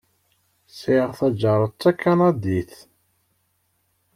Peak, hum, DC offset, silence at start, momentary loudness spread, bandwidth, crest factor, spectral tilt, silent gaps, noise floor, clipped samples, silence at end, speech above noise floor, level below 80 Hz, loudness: -4 dBFS; none; under 0.1%; 0.75 s; 9 LU; 15 kHz; 18 dB; -8 dB/octave; none; -69 dBFS; under 0.1%; 1.5 s; 49 dB; -58 dBFS; -21 LUFS